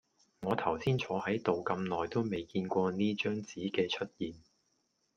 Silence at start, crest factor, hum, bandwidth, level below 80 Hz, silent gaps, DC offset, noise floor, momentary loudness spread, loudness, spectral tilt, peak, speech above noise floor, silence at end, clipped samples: 0.4 s; 20 dB; none; 8.6 kHz; -68 dBFS; none; under 0.1%; -78 dBFS; 6 LU; -34 LUFS; -6.5 dB/octave; -14 dBFS; 44 dB; 0.8 s; under 0.1%